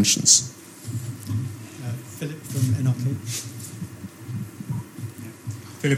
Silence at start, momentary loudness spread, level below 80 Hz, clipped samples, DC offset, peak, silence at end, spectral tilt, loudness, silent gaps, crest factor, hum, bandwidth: 0 s; 20 LU; -60 dBFS; under 0.1%; under 0.1%; -2 dBFS; 0 s; -3 dB/octave; -24 LUFS; none; 24 dB; none; 16.5 kHz